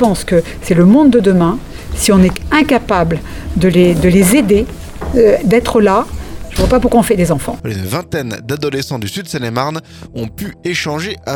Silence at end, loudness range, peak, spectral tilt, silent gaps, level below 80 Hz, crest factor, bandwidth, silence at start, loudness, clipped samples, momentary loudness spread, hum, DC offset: 0 s; 8 LU; 0 dBFS; -6 dB/octave; none; -28 dBFS; 12 dB; 18.5 kHz; 0 s; -13 LUFS; under 0.1%; 14 LU; none; under 0.1%